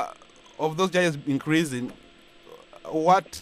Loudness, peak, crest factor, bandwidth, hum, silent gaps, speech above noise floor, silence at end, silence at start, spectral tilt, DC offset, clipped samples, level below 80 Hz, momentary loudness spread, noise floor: -25 LUFS; -6 dBFS; 20 dB; 15.5 kHz; none; none; 27 dB; 0 s; 0 s; -5 dB/octave; under 0.1%; under 0.1%; -64 dBFS; 13 LU; -51 dBFS